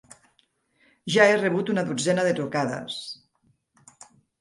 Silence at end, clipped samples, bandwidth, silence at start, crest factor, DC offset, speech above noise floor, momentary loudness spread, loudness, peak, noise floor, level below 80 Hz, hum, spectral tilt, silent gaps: 1.25 s; under 0.1%; 11.5 kHz; 1.05 s; 22 dB; under 0.1%; 44 dB; 19 LU; -23 LUFS; -4 dBFS; -68 dBFS; -72 dBFS; none; -4.5 dB/octave; none